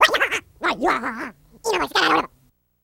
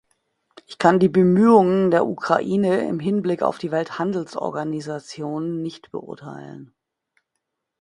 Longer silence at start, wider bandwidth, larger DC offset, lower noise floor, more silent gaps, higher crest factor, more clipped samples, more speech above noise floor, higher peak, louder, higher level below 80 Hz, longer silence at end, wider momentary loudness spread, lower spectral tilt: second, 0 s vs 0.7 s; first, 17 kHz vs 10.5 kHz; neither; second, -61 dBFS vs -79 dBFS; neither; about the same, 20 dB vs 20 dB; neither; second, 39 dB vs 59 dB; about the same, -2 dBFS vs 0 dBFS; about the same, -21 LUFS vs -20 LUFS; first, -54 dBFS vs -64 dBFS; second, 0.6 s vs 1.15 s; second, 15 LU vs 19 LU; second, -2 dB/octave vs -7.5 dB/octave